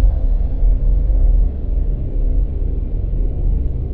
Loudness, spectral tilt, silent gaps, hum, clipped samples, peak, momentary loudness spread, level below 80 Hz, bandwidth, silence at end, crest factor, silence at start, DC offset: -21 LUFS; -12.5 dB/octave; none; none; under 0.1%; -2 dBFS; 5 LU; -16 dBFS; 1.1 kHz; 0 s; 12 dB; 0 s; under 0.1%